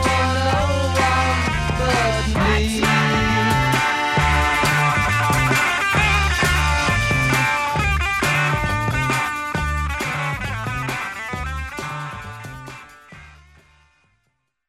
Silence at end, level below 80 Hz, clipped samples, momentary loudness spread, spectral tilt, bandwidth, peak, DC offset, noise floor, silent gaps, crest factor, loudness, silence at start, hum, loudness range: 1.4 s; -30 dBFS; under 0.1%; 11 LU; -4.5 dB/octave; 16 kHz; -4 dBFS; under 0.1%; -71 dBFS; none; 14 dB; -19 LUFS; 0 s; none; 11 LU